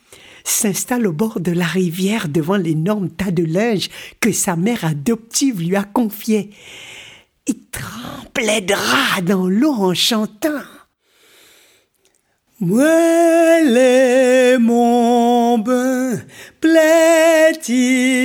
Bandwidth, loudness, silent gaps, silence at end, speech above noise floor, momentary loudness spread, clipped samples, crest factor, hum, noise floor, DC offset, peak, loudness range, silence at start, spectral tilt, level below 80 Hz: 19.5 kHz; -15 LUFS; none; 0 s; 46 dB; 14 LU; under 0.1%; 14 dB; none; -61 dBFS; under 0.1%; -2 dBFS; 8 LU; 0.45 s; -4.5 dB/octave; -54 dBFS